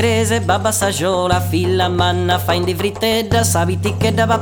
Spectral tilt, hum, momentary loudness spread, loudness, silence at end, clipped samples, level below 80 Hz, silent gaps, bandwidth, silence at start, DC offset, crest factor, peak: -4.5 dB/octave; none; 3 LU; -16 LUFS; 0 s; under 0.1%; -40 dBFS; none; over 20 kHz; 0 s; under 0.1%; 14 dB; -2 dBFS